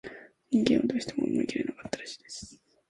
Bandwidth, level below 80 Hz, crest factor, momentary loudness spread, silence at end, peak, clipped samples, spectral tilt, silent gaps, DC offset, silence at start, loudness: 11.5 kHz; -62 dBFS; 22 dB; 19 LU; 0.35 s; -8 dBFS; under 0.1%; -5 dB/octave; none; under 0.1%; 0.05 s; -29 LUFS